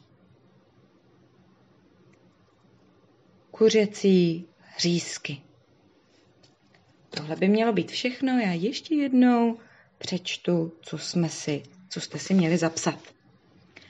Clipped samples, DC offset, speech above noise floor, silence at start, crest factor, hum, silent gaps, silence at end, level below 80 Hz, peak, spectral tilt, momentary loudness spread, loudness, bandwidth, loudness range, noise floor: under 0.1%; under 0.1%; 37 dB; 3.55 s; 18 dB; none; none; 0.9 s; -76 dBFS; -8 dBFS; -5.5 dB/octave; 16 LU; -25 LUFS; 10 kHz; 5 LU; -61 dBFS